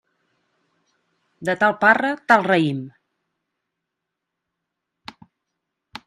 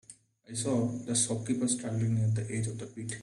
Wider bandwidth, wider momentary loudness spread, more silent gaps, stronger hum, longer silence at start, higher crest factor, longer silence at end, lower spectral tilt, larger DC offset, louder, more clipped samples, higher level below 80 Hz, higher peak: first, 13.5 kHz vs 11.5 kHz; first, 18 LU vs 9 LU; neither; neither; first, 1.4 s vs 0.1 s; first, 24 dB vs 18 dB; first, 3.2 s vs 0 s; about the same, -6 dB/octave vs -5 dB/octave; neither; first, -18 LUFS vs -31 LUFS; neither; second, -72 dBFS vs -64 dBFS; first, 0 dBFS vs -14 dBFS